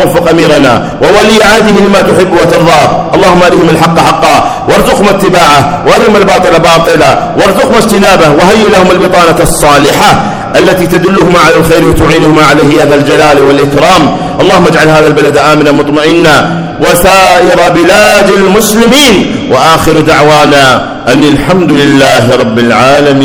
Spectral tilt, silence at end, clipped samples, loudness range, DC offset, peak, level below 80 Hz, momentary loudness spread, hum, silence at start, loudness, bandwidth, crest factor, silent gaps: -4.5 dB/octave; 0 s; 20%; 1 LU; under 0.1%; 0 dBFS; -26 dBFS; 3 LU; none; 0 s; -4 LUFS; over 20 kHz; 4 dB; none